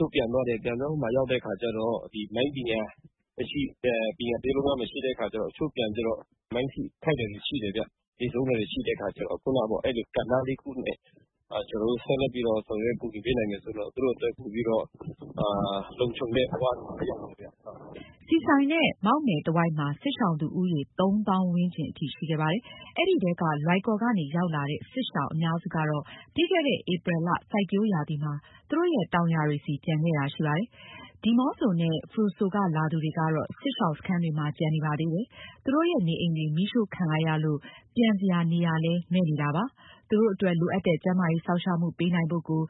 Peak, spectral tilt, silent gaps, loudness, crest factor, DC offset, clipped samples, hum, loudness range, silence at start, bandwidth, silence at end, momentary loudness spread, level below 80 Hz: -8 dBFS; -11 dB/octave; 8.08-8.12 s; -28 LUFS; 20 dB; under 0.1%; under 0.1%; none; 4 LU; 0 s; 4.1 kHz; 0 s; 9 LU; -56 dBFS